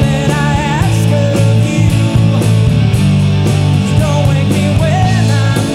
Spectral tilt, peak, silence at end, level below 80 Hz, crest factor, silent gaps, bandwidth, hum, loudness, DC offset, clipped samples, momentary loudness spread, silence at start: -6.5 dB/octave; 0 dBFS; 0 s; -26 dBFS; 10 dB; none; 13 kHz; none; -11 LUFS; under 0.1%; under 0.1%; 2 LU; 0 s